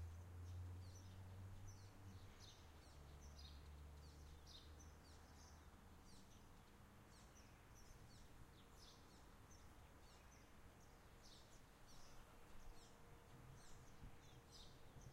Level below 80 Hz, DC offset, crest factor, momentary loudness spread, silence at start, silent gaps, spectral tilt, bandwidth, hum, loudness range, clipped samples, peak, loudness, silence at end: -68 dBFS; under 0.1%; 14 dB; 8 LU; 0 s; none; -4.5 dB/octave; 16 kHz; none; 5 LU; under 0.1%; -46 dBFS; -64 LUFS; 0 s